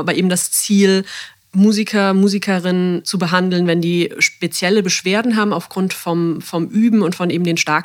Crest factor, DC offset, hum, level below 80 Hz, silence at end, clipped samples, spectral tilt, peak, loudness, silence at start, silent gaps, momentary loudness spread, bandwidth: 16 dB; under 0.1%; none; -68 dBFS; 0 s; under 0.1%; -4.5 dB/octave; 0 dBFS; -16 LUFS; 0 s; none; 6 LU; 17 kHz